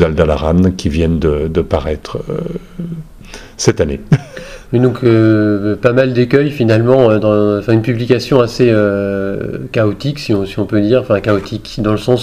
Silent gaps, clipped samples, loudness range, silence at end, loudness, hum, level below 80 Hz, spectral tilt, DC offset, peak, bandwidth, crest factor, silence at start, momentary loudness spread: none; 0.1%; 6 LU; 0 s; -13 LUFS; none; -30 dBFS; -7 dB/octave; under 0.1%; 0 dBFS; 14.5 kHz; 12 dB; 0 s; 12 LU